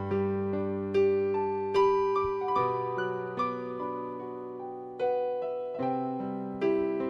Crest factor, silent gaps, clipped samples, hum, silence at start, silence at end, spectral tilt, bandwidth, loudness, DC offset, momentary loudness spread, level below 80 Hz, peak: 14 dB; none; under 0.1%; none; 0 s; 0 s; -8 dB/octave; 6.4 kHz; -30 LUFS; under 0.1%; 11 LU; -64 dBFS; -16 dBFS